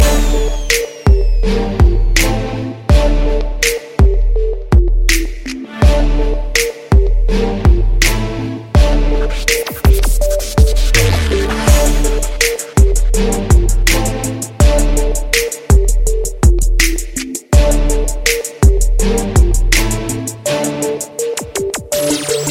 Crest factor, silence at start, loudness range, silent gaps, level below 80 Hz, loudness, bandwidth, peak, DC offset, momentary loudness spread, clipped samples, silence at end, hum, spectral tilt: 12 dB; 0 s; 1 LU; none; -14 dBFS; -14 LUFS; 16.5 kHz; 0 dBFS; under 0.1%; 7 LU; under 0.1%; 0 s; none; -4.5 dB/octave